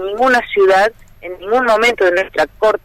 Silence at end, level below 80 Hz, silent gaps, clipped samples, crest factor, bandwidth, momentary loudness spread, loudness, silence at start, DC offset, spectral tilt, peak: 0.1 s; -44 dBFS; none; under 0.1%; 10 dB; 15.5 kHz; 13 LU; -13 LUFS; 0 s; under 0.1%; -3.5 dB/octave; -4 dBFS